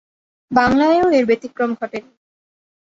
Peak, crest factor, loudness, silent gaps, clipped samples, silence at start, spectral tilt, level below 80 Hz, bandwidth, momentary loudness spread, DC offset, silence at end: -2 dBFS; 18 dB; -17 LUFS; none; under 0.1%; 0.5 s; -6 dB/octave; -50 dBFS; 7.8 kHz; 13 LU; under 0.1%; 0.9 s